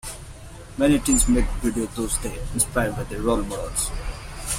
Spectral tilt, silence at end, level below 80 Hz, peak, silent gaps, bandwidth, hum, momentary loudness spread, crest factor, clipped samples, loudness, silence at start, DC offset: -4 dB/octave; 0 s; -30 dBFS; -4 dBFS; none; 16.5 kHz; none; 17 LU; 20 dB; under 0.1%; -23 LUFS; 0.05 s; under 0.1%